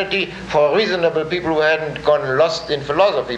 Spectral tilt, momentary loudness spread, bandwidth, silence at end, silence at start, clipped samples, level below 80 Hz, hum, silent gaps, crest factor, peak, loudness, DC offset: -5 dB/octave; 5 LU; 9 kHz; 0 s; 0 s; under 0.1%; -48 dBFS; none; none; 14 dB; -2 dBFS; -17 LUFS; under 0.1%